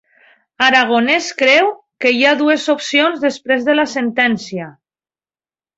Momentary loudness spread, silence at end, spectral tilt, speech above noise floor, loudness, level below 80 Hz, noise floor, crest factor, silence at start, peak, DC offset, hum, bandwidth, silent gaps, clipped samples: 8 LU; 1.1 s; -3 dB/octave; over 76 dB; -14 LUFS; -62 dBFS; under -90 dBFS; 16 dB; 0.6 s; 0 dBFS; under 0.1%; none; 8 kHz; none; under 0.1%